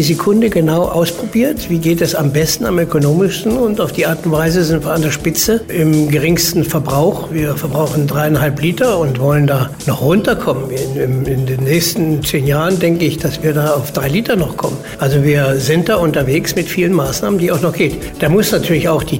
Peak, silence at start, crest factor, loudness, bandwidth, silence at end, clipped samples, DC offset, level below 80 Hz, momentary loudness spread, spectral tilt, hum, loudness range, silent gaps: -2 dBFS; 0 s; 10 dB; -14 LUFS; 16.5 kHz; 0 s; under 0.1%; under 0.1%; -36 dBFS; 4 LU; -5.5 dB/octave; none; 1 LU; none